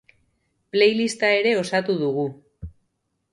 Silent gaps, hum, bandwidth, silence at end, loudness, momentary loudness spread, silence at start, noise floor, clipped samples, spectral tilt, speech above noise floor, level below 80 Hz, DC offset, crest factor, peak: none; none; 11.5 kHz; 0.65 s; -21 LUFS; 23 LU; 0.75 s; -74 dBFS; under 0.1%; -4.5 dB/octave; 53 dB; -52 dBFS; under 0.1%; 18 dB; -6 dBFS